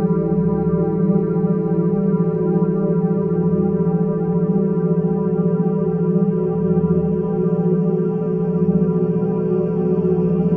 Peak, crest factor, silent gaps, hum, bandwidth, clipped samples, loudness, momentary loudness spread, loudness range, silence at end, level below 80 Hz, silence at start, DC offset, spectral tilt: -6 dBFS; 12 dB; none; none; 2.8 kHz; under 0.1%; -18 LUFS; 2 LU; 0 LU; 0 s; -44 dBFS; 0 s; under 0.1%; -14 dB/octave